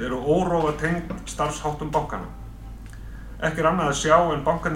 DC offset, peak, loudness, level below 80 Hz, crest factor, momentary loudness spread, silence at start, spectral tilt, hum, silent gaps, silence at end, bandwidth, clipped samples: under 0.1%; -4 dBFS; -23 LUFS; -38 dBFS; 20 dB; 22 LU; 0 s; -5 dB/octave; none; none; 0 s; 16 kHz; under 0.1%